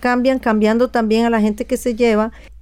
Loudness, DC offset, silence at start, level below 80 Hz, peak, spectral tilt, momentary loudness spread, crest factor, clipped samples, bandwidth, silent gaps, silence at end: -16 LUFS; under 0.1%; 0 s; -40 dBFS; -4 dBFS; -5.5 dB/octave; 5 LU; 12 dB; under 0.1%; 15 kHz; none; 0.05 s